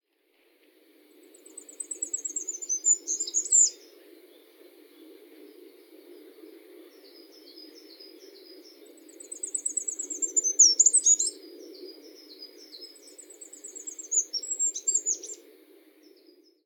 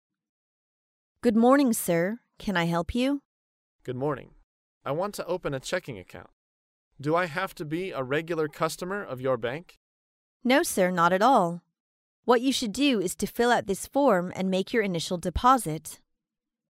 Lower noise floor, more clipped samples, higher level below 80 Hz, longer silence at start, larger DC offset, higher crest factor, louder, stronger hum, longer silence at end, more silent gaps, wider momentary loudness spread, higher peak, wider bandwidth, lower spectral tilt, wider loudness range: second, -68 dBFS vs -88 dBFS; neither; second, under -90 dBFS vs -50 dBFS; first, 1.55 s vs 1.25 s; neither; about the same, 24 dB vs 20 dB; first, -23 LUFS vs -26 LUFS; neither; first, 1.3 s vs 0.8 s; second, none vs 3.25-3.79 s, 4.44-4.81 s, 6.33-6.91 s, 9.77-10.40 s, 11.80-12.23 s; first, 28 LU vs 14 LU; about the same, -8 dBFS vs -8 dBFS; first, 18 kHz vs 16 kHz; second, 5 dB/octave vs -5 dB/octave; first, 12 LU vs 8 LU